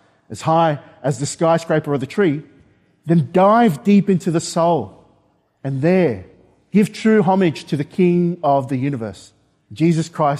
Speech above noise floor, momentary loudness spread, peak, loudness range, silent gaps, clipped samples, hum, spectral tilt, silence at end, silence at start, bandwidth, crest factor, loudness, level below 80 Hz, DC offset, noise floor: 43 dB; 12 LU; -4 dBFS; 2 LU; none; under 0.1%; none; -7 dB/octave; 0 s; 0.3 s; 13.5 kHz; 14 dB; -17 LUFS; -60 dBFS; under 0.1%; -60 dBFS